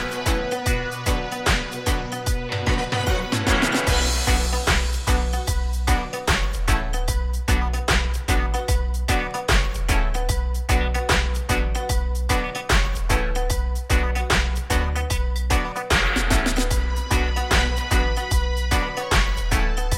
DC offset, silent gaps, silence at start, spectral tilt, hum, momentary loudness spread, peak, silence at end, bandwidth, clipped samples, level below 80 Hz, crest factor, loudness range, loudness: under 0.1%; none; 0 s; -4 dB/octave; none; 4 LU; -6 dBFS; 0 s; 16.5 kHz; under 0.1%; -22 dBFS; 16 dB; 2 LU; -22 LUFS